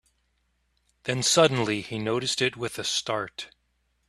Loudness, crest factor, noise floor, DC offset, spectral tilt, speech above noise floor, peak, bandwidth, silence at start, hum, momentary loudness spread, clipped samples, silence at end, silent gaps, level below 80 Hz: -25 LUFS; 24 dB; -72 dBFS; under 0.1%; -3 dB/octave; 46 dB; -4 dBFS; 13.5 kHz; 1.05 s; none; 16 LU; under 0.1%; 0.65 s; none; -62 dBFS